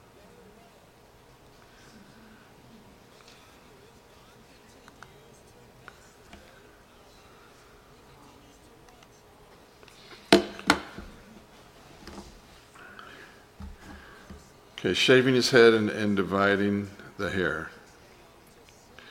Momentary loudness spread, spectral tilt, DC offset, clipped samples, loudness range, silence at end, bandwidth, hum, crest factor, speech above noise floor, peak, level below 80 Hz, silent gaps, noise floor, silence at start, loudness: 29 LU; -4.5 dB/octave; under 0.1%; under 0.1%; 24 LU; 1.4 s; 16.5 kHz; none; 30 dB; 33 dB; -2 dBFS; -58 dBFS; none; -55 dBFS; 10.1 s; -24 LUFS